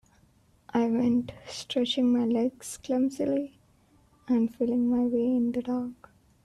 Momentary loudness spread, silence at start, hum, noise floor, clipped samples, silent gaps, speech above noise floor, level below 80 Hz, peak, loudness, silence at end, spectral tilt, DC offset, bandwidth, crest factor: 9 LU; 0.75 s; none; -63 dBFS; under 0.1%; none; 36 dB; -64 dBFS; -14 dBFS; -27 LUFS; 0.5 s; -5.5 dB/octave; under 0.1%; 12.5 kHz; 14 dB